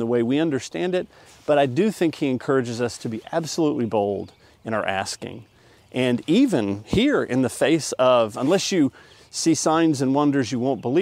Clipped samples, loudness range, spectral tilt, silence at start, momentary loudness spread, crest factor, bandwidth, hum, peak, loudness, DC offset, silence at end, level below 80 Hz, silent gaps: under 0.1%; 5 LU; -5 dB/octave; 0 s; 11 LU; 16 dB; 15.5 kHz; none; -6 dBFS; -22 LUFS; under 0.1%; 0 s; -54 dBFS; none